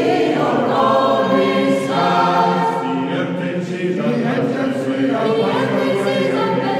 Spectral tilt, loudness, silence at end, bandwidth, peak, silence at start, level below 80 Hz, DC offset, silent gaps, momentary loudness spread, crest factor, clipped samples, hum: -6.5 dB/octave; -17 LUFS; 0 s; 15 kHz; -4 dBFS; 0 s; -66 dBFS; under 0.1%; none; 6 LU; 14 dB; under 0.1%; none